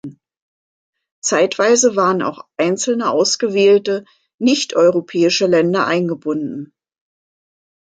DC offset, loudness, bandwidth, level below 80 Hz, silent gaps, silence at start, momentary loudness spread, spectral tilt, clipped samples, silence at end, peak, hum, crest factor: under 0.1%; -16 LUFS; 9.4 kHz; -66 dBFS; 0.42-0.93 s, 1.12-1.22 s, 4.34-4.39 s; 0.05 s; 10 LU; -3.5 dB/octave; under 0.1%; 1.35 s; -2 dBFS; none; 16 dB